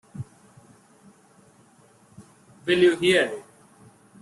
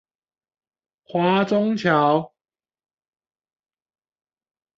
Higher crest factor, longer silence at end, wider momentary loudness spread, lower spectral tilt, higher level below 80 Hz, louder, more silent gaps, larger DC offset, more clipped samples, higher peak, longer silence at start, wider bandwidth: about the same, 20 dB vs 20 dB; second, 0.8 s vs 2.5 s; first, 22 LU vs 8 LU; second, -4.5 dB/octave vs -7 dB/octave; about the same, -66 dBFS vs -68 dBFS; about the same, -21 LUFS vs -20 LUFS; neither; neither; neither; second, -8 dBFS vs -4 dBFS; second, 0.15 s vs 1.15 s; first, 12 kHz vs 7.6 kHz